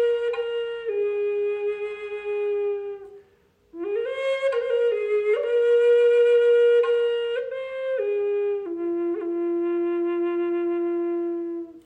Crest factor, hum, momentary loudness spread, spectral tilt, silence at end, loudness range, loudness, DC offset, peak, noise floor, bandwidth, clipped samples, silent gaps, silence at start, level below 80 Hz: 10 dB; none; 12 LU; -4.5 dB/octave; 0.05 s; 8 LU; -24 LUFS; under 0.1%; -12 dBFS; -61 dBFS; 8.2 kHz; under 0.1%; none; 0 s; -70 dBFS